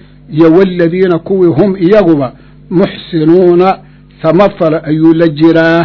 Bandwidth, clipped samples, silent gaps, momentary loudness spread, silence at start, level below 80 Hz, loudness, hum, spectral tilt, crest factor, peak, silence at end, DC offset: 6 kHz; 4%; none; 7 LU; 0.3 s; -40 dBFS; -8 LUFS; none; -9.5 dB/octave; 8 dB; 0 dBFS; 0 s; under 0.1%